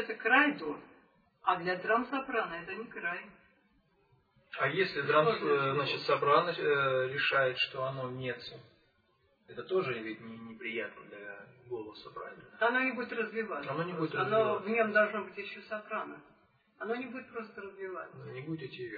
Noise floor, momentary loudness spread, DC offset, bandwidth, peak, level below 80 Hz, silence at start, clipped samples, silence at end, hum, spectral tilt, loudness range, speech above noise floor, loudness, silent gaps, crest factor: -72 dBFS; 18 LU; under 0.1%; 5 kHz; -12 dBFS; -76 dBFS; 0 s; under 0.1%; 0 s; none; -7 dB/octave; 10 LU; 39 dB; -32 LUFS; none; 22 dB